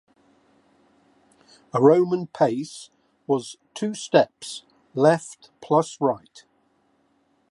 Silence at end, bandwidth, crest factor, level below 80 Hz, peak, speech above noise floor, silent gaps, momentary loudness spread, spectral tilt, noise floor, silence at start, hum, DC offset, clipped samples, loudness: 1.35 s; 11.5 kHz; 22 dB; -74 dBFS; -2 dBFS; 44 dB; none; 20 LU; -6 dB/octave; -66 dBFS; 1.75 s; none; under 0.1%; under 0.1%; -22 LUFS